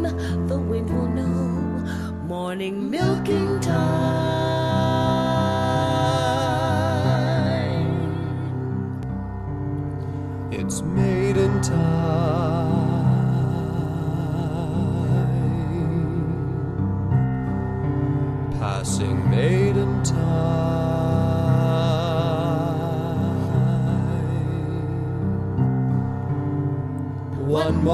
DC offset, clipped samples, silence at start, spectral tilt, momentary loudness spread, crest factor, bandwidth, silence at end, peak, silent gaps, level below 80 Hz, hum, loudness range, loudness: under 0.1%; under 0.1%; 0 s; -7 dB/octave; 7 LU; 14 dB; 12.5 kHz; 0 s; -8 dBFS; none; -40 dBFS; none; 3 LU; -23 LUFS